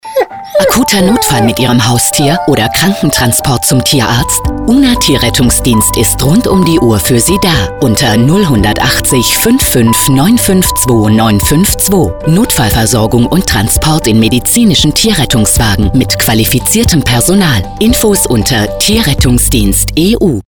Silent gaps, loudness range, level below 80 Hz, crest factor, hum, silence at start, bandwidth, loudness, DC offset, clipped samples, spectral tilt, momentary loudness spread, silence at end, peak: none; 1 LU; -22 dBFS; 8 dB; none; 0.05 s; over 20 kHz; -8 LUFS; 0.9%; under 0.1%; -4 dB/octave; 2 LU; 0.05 s; 0 dBFS